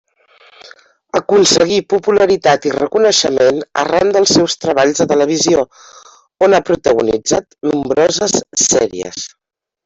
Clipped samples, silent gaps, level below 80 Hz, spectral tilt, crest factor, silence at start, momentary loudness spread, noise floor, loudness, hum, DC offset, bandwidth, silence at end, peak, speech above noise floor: under 0.1%; none; -50 dBFS; -3 dB/octave; 12 dB; 0.65 s; 8 LU; -48 dBFS; -13 LUFS; none; under 0.1%; 8.4 kHz; 0.6 s; 0 dBFS; 35 dB